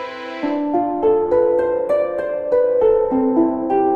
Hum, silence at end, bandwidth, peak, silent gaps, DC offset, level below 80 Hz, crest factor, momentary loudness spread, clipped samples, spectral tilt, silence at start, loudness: none; 0 s; 5.2 kHz; -4 dBFS; none; under 0.1%; -50 dBFS; 12 dB; 7 LU; under 0.1%; -8 dB/octave; 0 s; -18 LUFS